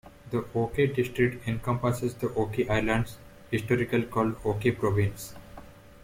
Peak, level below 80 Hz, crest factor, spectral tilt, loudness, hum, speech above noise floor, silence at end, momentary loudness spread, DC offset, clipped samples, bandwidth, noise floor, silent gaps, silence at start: -10 dBFS; -48 dBFS; 18 dB; -7 dB/octave; -28 LUFS; none; 20 dB; 0 s; 10 LU; under 0.1%; under 0.1%; 16.5 kHz; -48 dBFS; none; 0.05 s